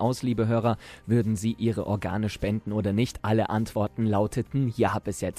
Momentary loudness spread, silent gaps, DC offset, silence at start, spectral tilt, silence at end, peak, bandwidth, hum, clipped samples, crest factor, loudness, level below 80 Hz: 4 LU; none; under 0.1%; 0 s; -7 dB/octave; 0 s; -10 dBFS; 14 kHz; none; under 0.1%; 16 dB; -27 LUFS; -50 dBFS